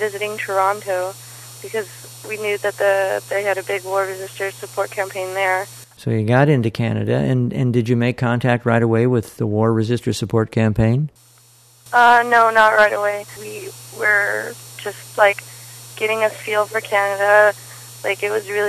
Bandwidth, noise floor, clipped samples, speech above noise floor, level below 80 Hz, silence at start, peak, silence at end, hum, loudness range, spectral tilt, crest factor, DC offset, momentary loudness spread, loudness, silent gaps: 14 kHz; -50 dBFS; under 0.1%; 32 dB; -50 dBFS; 0 s; 0 dBFS; 0 s; none; 6 LU; -5.5 dB/octave; 18 dB; under 0.1%; 17 LU; -18 LUFS; none